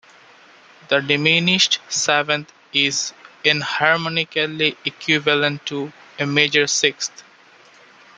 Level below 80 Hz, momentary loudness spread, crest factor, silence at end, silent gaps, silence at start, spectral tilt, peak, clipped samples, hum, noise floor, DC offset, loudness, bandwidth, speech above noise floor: -66 dBFS; 11 LU; 20 dB; 0.95 s; none; 0.9 s; -2.5 dB/octave; 0 dBFS; under 0.1%; none; -49 dBFS; under 0.1%; -18 LUFS; 10 kHz; 30 dB